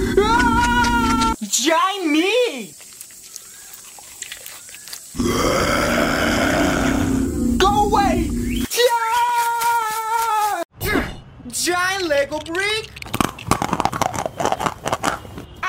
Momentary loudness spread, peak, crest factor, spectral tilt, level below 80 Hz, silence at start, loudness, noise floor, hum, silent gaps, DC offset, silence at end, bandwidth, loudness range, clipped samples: 18 LU; -4 dBFS; 16 dB; -3.5 dB/octave; -34 dBFS; 0 s; -19 LUFS; -40 dBFS; none; 10.65-10.69 s; under 0.1%; 0 s; 16.5 kHz; 5 LU; under 0.1%